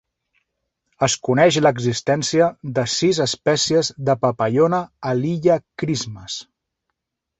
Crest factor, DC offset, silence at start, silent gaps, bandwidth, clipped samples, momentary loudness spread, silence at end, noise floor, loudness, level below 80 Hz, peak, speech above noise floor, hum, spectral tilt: 18 dB; under 0.1%; 1 s; none; 8.4 kHz; under 0.1%; 8 LU; 0.95 s; -78 dBFS; -19 LUFS; -56 dBFS; -2 dBFS; 59 dB; none; -4.5 dB/octave